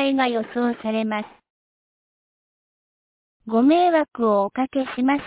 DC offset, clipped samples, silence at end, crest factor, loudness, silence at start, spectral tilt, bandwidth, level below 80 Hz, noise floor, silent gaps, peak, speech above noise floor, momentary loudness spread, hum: under 0.1%; under 0.1%; 0 s; 16 dB; -21 LUFS; 0 s; -9.5 dB/octave; 4 kHz; -64 dBFS; under -90 dBFS; 1.50-3.40 s; -6 dBFS; over 69 dB; 8 LU; none